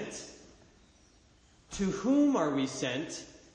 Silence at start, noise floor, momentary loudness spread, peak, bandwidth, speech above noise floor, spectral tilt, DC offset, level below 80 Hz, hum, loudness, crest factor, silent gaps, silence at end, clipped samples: 0 s; -62 dBFS; 18 LU; -18 dBFS; 9.8 kHz; 33 dB; -5 dB/octave; under 0.1%; -60 dBFS; none; -31 LUFS; 16 dB; none; 0.2 s; under 0.1%